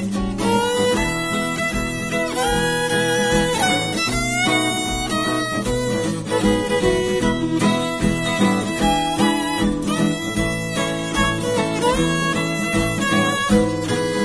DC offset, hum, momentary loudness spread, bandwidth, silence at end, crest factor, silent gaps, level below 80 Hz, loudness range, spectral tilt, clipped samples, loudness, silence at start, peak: 0.3%; none; 4 LU; 11 kHz; 0 s; 16 dB; none; -36 dBFS; 1 LU; -4 dB/octave; under 0.1%; -19 LUFS; 0 s; -4 dBFS